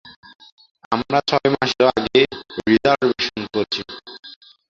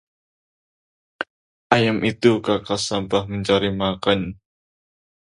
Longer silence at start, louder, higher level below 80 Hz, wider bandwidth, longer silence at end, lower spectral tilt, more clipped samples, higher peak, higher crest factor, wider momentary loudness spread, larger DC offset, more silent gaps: second, 0.05 s vs 1.2 s; about the same, -19 LUFS vs -20 LUFS; about the same, -54 dBFS vs -50 dBFS; second, 7.6 kHz vs 11 kHz; second, 0.4 s vs 0.9 s; about the same, -5 dB/octave vs -5 dB/octave; neither; about the same, -2 dBFS vs 0 dBFS; about the same, 18 dB vs 22 dB; about the same, 14 LU vs 14 LU; neither; second, 0.16-0.23 s, 0.35-0.39 s, 0.52-0.58 s, 0.71-0.75 s, 0.85-0.91 s vs 1.30-1.70 s